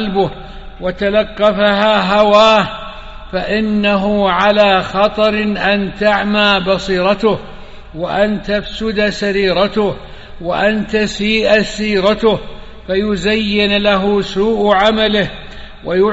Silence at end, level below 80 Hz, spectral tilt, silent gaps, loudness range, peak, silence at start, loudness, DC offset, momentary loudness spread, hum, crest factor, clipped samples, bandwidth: 0 s; -34 dBFS; -3 dB/octave; none; 3 LU; 0 dBFS; 0 s; -14 LUFS; under 0.1%; 12 LU; none; 14 dB; under 0.1%; 8 kHz